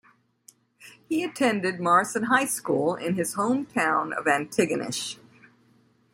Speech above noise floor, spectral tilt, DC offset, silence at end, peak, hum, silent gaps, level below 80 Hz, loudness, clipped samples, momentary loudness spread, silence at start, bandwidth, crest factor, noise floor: 37 dB; -4 dB/octave; under 0.1%; 1 s; -6 dBFS; none; none; -70 dBFS; -25 LUFS; under 0.1%; 8 LU; 0.8 s; 16.5 kHz; 20 dB; -62 dBFS